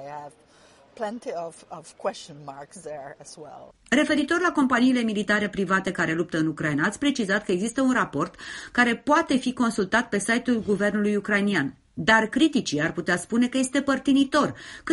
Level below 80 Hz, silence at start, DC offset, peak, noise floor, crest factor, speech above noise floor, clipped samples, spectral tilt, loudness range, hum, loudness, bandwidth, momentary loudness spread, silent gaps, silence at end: -58 dBFS; 0 s; under 0.1%; -4 dBFS; -55 dBFS; 20 dB; 31 dB; under 0.1%; -4.5 dB/octave; 7 LU; none; -24 LUFS; 11.5 kHz; 18 LU; none; 0 s